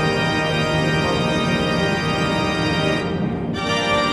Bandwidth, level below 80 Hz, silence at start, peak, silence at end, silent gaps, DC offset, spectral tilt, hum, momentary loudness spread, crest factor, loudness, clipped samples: 13 kHz; -40 dBFS; 0 s; -8 dBFS; 0 s; none; under 0.1%; -5.5 dB/octave; none; 3 LU; 12 dB; -20 LUFS; under 0.1%